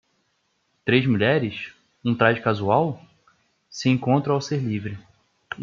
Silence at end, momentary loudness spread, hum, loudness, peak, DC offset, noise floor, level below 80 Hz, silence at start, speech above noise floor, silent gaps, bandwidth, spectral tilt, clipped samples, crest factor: 0 s; 17 LU; none; -22 LUFS; -4 dBFS; under 0.1%; -70 dBFS; -64 dBFS; 0.85 s; 49 dB; none; 7.4 kHz; -6.5 dB/octave; under 0.1%; 20 dB